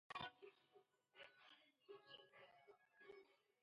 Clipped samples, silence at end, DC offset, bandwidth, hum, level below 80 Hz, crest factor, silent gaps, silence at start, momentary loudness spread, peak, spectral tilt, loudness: under 0.1%; 0.2 s; under 0.1%; 7.2 kHz; none; under -90 dBFS; 24 dB; none; 0.1 s; 14 LU; -40 dBFS; -0.5 dB/octave; -62 LUFS